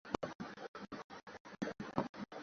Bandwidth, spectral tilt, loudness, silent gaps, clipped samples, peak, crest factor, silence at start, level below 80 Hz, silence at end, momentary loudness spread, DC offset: 7.4 kHz; -4.5 dB/octave; -46 LUFS; 0.35-0.39 s, 0.68-0.74 s, 1.04-1.10 s, 1.40-1.45 s, 2.09-2.14 s; under 0.1%; -18 dBFS; 28 dB; 0.05 s; -70 dBFS; 0 s; 11 LU; under 0.1%